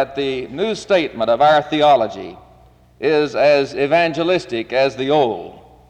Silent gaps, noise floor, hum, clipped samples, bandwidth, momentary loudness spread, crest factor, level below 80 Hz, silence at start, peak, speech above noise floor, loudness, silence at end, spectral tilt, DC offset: none; -48 dBFS; none; under 0.1%; 9.6 kHz; 10 LU; 12 dB; -52 dBFS; 0 s; -4 dBFS; 32 dB; -17 LUFS; 0.3 s; -5.5 dB/octave; under 0.1%